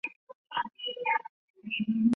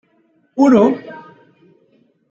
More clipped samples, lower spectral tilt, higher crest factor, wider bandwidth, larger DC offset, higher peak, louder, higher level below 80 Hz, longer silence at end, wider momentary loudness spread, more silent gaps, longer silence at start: neither; second, -6 dB/octave vs -7.5 dB/octave; about the same, 16 dB vs 16 dB; second, 3.8 kHz vs 7.4 kHz; neither; second, -14 dBFS vs -2 dBFS; second, -32 LUFS vs -14 LUFS; second, -76 dBFS vs -60 dBFS; second, 0 s vs 1.1 s; second, 14 LU vs 25 LU; first, 0.16-0.27 s, 0.35-0.45 s, 1.29-1.54 s vs none; second, 0.05 s vs 0.55 s